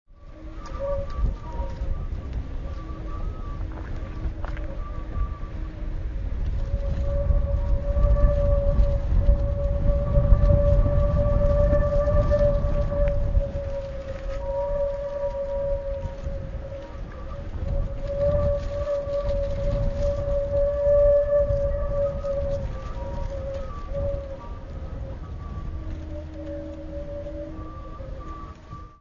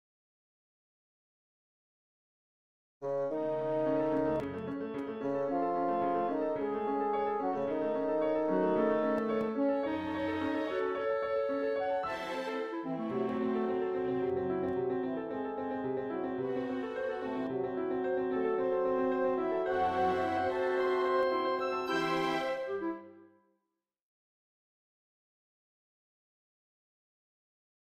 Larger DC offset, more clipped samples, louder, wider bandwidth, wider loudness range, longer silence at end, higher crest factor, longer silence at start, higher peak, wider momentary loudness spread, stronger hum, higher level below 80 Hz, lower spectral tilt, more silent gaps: neither; neither; first, -27 LUFS vs -33 LUFS; second, 6.8 kHz vs 10 kHz; first, 12 LU vs 5 LU; second, 0.05 s vs 4.7 s; first, 22 dB vs 16 dB; second, 0.1 s vs 3 s; first, -2 dBFS vs -18 dBFS; first, 15 LU vs 6 LU; neither; first, -26 dBFS vs -68 dBFS; first, -9 dB/octave vs -7 dB/octave; neither